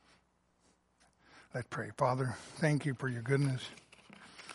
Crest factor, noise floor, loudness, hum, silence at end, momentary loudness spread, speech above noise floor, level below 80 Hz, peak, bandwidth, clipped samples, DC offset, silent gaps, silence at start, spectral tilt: 22 dB; -73 dBFS; -35 LUFS; none; 0 s; 19 LU; 39 dB; -72 dBFS; -16 dBFS; 11.5 kHz; under 0.1%; under 0.1%; none; 1.35 s; -6.5 dB/octave